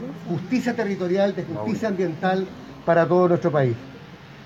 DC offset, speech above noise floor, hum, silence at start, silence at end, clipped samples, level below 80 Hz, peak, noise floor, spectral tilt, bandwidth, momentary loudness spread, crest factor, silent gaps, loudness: under 0.1%; 20 dB; none; 0 s; 0 s; under 0.1%; -60 dBFS; -6 dBFS; -42 dBFS; -7.5 dB/octave; 7.8 kHz; 14 LU; 16 dB; none; -23 LUFS